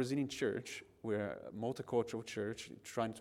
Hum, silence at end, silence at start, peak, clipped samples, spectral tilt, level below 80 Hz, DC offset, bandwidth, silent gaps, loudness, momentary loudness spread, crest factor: none; 0 s; 0 s; -22 dBFS; under 0.1%; -5.5 dB/octave; -74 dBFS; under 0.1%; 16 kHz; none; -41 LUFS; 7 LU; 18 dB